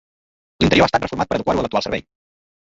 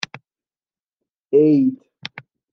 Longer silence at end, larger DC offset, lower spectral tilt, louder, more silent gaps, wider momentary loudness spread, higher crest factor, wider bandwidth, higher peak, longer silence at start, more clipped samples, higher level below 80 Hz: first, 0.7 s vs 0.35 s; neither; second, -5.5 dB/octave vs -7 dB/octave; about the same, -19 LUFS vs -17 LUFS; second, none vs 0.93-0.97 s, 1.20-1.25 s; second, 9 LU vs 20 LU; about the same, 20 dB vs 18 dB; first, 8 kHz vs 7 kHz; about the same, -2 dBFS vs -4 dBFS; first, 0.6 s vs 0.15 s; neither; first, -40 dBFS vs -76 dBFS